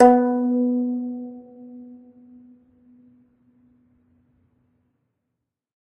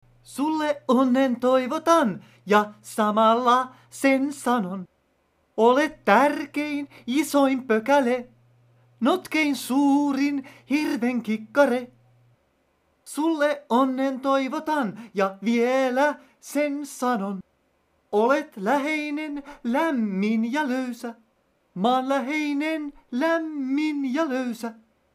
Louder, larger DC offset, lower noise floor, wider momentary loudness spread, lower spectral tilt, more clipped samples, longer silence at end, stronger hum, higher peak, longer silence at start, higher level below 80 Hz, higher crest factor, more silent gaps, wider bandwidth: about the same, -21 LUFS vs -23 LUFS; neither; first, -81 dBFS vs -67 dBFS; first, 24 LU vs 11 LU; first, -7 dB/octave vs -5 dB/octave; neither; first, 4 s vs 0.4 s; neither; about the same, 0 dBFS vs -2 dBFS; second, 0 s vs 0.3 s; first, -64 dBFS vs -70 dBFS; about the same, 24 dB vs 22 dB; neither; second, 5.4 kHz vs 15.5 kHz